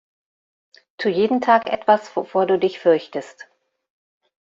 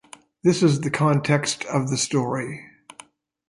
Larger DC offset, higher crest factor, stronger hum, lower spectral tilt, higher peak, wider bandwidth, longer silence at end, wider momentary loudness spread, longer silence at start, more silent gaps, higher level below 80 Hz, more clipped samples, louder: neither; about the same, 20 dB vs 16 dB; neither; about the same, -6 dB/octave vs -5 dB/octave; first, -2 dBFS vs -6 dBFS; second, 7.6 kHz vs 11.5 kHz; first, 1.1 s vs 0.8 s; about the same, 11 LU vs 9 LU; first, 1 s vs 0.45 s; neither; second, -68 dBFS vs -62 dBFS; neither; first, -19 LUFS vs -22 LUFS